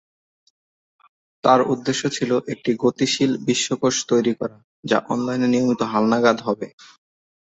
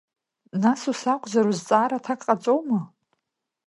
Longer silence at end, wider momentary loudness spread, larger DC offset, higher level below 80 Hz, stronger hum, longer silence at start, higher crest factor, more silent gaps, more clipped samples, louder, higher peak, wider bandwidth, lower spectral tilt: about the same, 0.9 s vs 0.8 s; about the same, 8 LU vs 6 LU; neither; first, -62 dBFS vs -76 dBFS; neither; first, 1.45 s vs 0.55 s; about the same, 20 dB vs 20 dB; first, 4.64-4.83 s vs none; neither; first, -20 LUFS vs -24 LUFS; about the same, -2 dBFS vs -4 dBFS; second, 8.2 kHz vs 11.5 kHz; about the same, -4.5 dB/octave vs -5.5 dB/octave